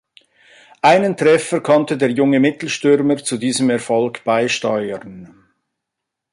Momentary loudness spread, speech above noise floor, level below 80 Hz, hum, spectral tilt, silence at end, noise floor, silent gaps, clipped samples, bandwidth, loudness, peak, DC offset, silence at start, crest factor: 6 LU; 65 dB; -62 dBFS; none; -5 dB/octave; 1.05 s; -81 dBFS; none; under 0.1%; 11.5 kHz; -16 LUFS; -2 dBFS; under 0.1%; 0.85 s; 16 dB